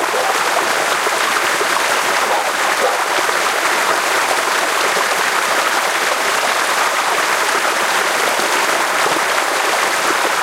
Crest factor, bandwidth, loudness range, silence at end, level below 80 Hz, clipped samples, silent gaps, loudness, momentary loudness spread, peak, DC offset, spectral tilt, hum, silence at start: 16 dB; 16 kHz; 0 LU; 0 s; -64 dBFS; under 0.1%; none; -15 LUFS; 1 LU; 0 dBFS; under 0.1%; 0 dB/octave; none; 0 s